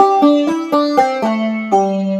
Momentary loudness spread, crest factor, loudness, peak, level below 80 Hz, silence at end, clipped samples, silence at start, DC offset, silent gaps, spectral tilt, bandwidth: 5 LU; 14 dB; -14 LUFS; 0 dBFS; -68 dBFS; 0 s; under 0.1%; 0 s; under 0.1%; none; -6.5 dB/octave; 14 kHz